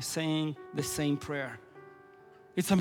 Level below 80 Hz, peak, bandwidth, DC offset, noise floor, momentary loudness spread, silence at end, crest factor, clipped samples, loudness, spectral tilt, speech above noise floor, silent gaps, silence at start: -62 dBFS; -14 dBFS; 18.5 kHz; under 0.1%; -56 dBFS; 21 LU; 0 s; 20 dB; under 0.1%; -33 LUFS; -5 dB/octave; 23 dB; none; 0 s